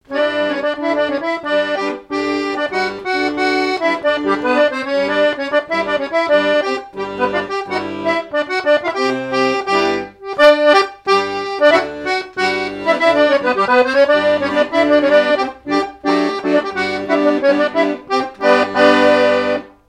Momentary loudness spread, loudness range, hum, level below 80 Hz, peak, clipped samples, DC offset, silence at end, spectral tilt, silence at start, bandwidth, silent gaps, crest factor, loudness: 8 LU; 4 LU; none; -52 dBFS; 0 dBFS; under 0.1%; under 0.1%; 0.2 s; -4.5 dB/octave; 0.1 s; 10.5 kHz; none; 16 dB; -15 LUFS